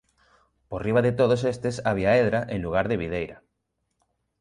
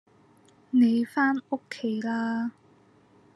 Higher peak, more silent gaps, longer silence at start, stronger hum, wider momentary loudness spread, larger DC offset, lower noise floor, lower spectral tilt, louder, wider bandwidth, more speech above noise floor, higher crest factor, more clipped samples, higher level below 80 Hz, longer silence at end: first, -8 dBFS vs -12 dBFS; neither; about the same, 0.7 s vs 0.75 s; neither; about the same, 11 LU vs 10 LU; neither; first, -77 dBFS vs -59 dBFS; about the same, -7 dB/octave vs -6 dB/octave; first, -24 LUFS vs -27 LUFS; about the same, 11 kHz vs 11.5 kHz; first, 54 dB vs 34 dB; about the same, 16 dB vs 16 dB; neither; first, -48 dBFS vs -82 dBFS; first, 1.05 s vs 0.85 s